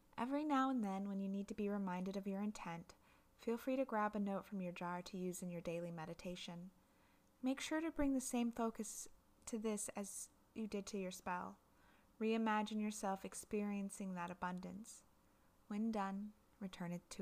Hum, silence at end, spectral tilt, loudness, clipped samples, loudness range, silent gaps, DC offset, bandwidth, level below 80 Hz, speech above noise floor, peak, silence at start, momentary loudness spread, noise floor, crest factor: none; 0 s; -5 dB/octave; -44 LUFS; under 0.1%; 4 LU; none; under 0.1%; 15.5 kHz; -68 dBFS; 29 dB; -26 dBFS; 0.15 s; 12 LU; -73 dBFS; 18 dB